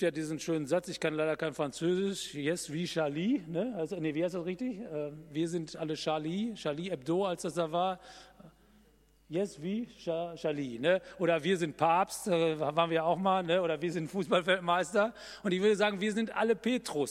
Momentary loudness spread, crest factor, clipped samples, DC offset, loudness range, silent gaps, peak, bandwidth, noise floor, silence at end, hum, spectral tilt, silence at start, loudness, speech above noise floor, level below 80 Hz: 8 LU; 20 dB; under 0.1%; under 0.1%; 6 LU; none; -12 dBFS; 15.5 kHz; -64 dBFS; 0 s; none; -5 dB/octave; 0 s; -32 LUFS; 33 dB; -68 dBFS